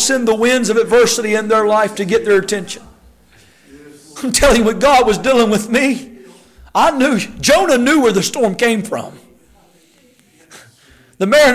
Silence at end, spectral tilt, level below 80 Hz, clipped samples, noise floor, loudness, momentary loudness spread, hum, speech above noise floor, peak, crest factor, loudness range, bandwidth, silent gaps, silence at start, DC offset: 0 s; -3.5 dB/octave; -38 dBFS; under 0.1%; -51 dBFS; -13 LUFS; 11 LU; none; 38 dB; -4 dBFS; 12 dB; 4 LU; 16 kHz; none; 0 s; under 0.1%